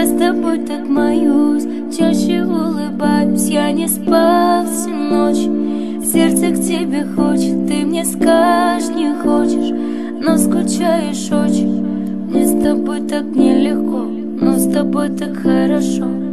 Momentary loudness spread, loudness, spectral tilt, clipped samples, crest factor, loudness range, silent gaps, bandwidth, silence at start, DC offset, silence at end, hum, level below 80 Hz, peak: 6 LU; -15 LUFS; -5 dB/octave; under 0.1%; 14 dB; 1 LU; none; 13.5 kHz; 0 s; 2%; 0 s; none; -48 dBFS; 0 dBFS